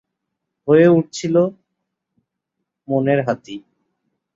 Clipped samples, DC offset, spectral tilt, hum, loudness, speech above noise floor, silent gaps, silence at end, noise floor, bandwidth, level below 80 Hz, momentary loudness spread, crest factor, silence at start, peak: under 0.1%; under 0.1%; -7 dB/octave; none; -17 LUFS; 63 dB; none; 0.75 s; -79 dBFS; 7.8 kHz; -64 dBFS; 18 LU; 18 dB; 0.65 s; -2 dBFS